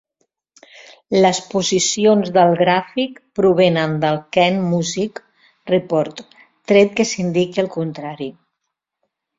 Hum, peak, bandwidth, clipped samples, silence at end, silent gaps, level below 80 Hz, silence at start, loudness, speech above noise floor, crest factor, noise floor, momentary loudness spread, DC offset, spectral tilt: none; -2 dBFS; 7.8 kHz; under 0.1%; 1.05 s; none; -58 dBFS; 1.1 s; -17 LUFS; 61 dB; 16 dB; -78 dBFS; 13 LU; under 0.1%; -4.5 dB/octave